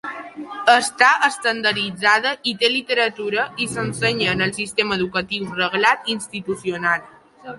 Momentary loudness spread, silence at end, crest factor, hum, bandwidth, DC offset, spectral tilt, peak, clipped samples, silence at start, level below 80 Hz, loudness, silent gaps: 10 LU; 0 s; 20 dB; none; 11.5 kHz; under 0.1%; -3 dB/octave; -2 dBFS; under 0.1%; 0.05 s; -56 dBFS; -19 LUFS; none